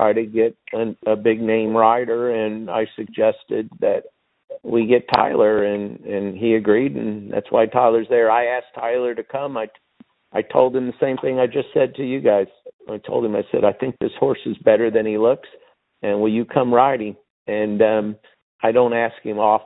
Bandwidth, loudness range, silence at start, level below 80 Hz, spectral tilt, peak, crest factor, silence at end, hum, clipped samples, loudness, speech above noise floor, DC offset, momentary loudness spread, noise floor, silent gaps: 5.4 kHz; 2 LU; 0 s; -60 dBFS; -10 dB/octave; 0 dBFS; 20 dB; 0.05 s; none; under 0.1%; -19 LUFS; 34 dB; under 0.1%; 11 LU; -53 dBFS; 4.44-4.48 s, 12.73-12.79 s, 17.30-17.46 s, 18.42-18.59 s